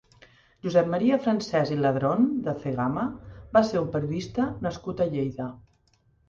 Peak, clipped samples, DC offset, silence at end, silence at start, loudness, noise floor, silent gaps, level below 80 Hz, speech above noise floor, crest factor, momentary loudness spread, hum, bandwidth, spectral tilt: -6 dBFS; under 0.1%; under 0.1%; 0.7 s; 0.65 s; -26 LUFS; -65 dBFS; none; -54 dBFS; 40 dB; 20 dB; 9 LU; none; 7.4 kHz; -7.5 dB/octave